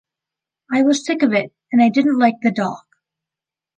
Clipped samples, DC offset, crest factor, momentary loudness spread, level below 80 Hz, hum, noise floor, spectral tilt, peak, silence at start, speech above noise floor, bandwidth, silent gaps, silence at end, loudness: under 0.1%; under 0.1%; 16 dB; 8 LU; -70 dBFS; none; -88 dBFS; -5 dB/octave; -2 dBFS; 0.7 s; 72 dB; 9.4 kHz; none; 1 s; -17 LUFS